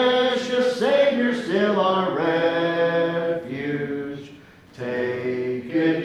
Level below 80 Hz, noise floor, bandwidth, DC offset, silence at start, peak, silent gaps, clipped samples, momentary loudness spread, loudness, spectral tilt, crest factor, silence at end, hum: -64 dBFS; -46 dBFS; 11.5 kHz; under 0.1%; 0 s; -8 dBFS; none; under 0.1%; 10 LU; -22 LUFS; -6 dB/octave; 14 dB; 0 s; none